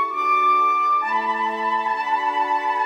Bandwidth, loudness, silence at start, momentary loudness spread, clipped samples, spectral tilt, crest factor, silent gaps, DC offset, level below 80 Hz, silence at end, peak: 14 kHz; -20 LUFS; 0 s; 5 LU; under 0.1%; -2.5 dB/octave; 10 dB; none; under 0.1%; -72 dBFS; 0 s; -10 dBFS